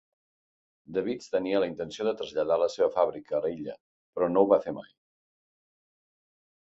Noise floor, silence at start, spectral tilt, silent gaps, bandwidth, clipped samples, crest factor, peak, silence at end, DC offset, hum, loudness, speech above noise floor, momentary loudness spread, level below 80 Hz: under -90 dBFS; 0.9 s; -6 dB/octave; 3.80-4.13 s; 7.8 kHz; under 0.1%; 22 dB; -8 dBFS; 1.8 s; under 0.1%; none; -28 LUFS; over 62 dB; 14 LU; -68 dBFS